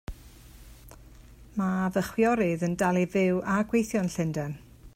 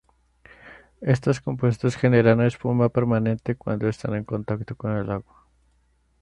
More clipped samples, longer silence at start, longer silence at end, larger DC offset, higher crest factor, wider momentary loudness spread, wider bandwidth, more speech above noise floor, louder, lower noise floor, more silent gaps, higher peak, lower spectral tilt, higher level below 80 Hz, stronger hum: neither; second, 0.1 s vs 0.65 s; second, 0.1 s vs 1 s; neither; about the same, 16 dB vs 20 dB; about the same, 11 LU vs 11 LU; first, 16 kHz vs 9.4 kHz; second, 24 dB vs 42 dB; second, -27 LUFS vs -23 LUFS; second, -50 dBFS vs -64 dBFS; neither; second, -12 dBFS vs -4 dBFS; second, -6.5 dB/octave vs -8 dB/octave; about the same, -50 dBFS vs -52 dBFS; neither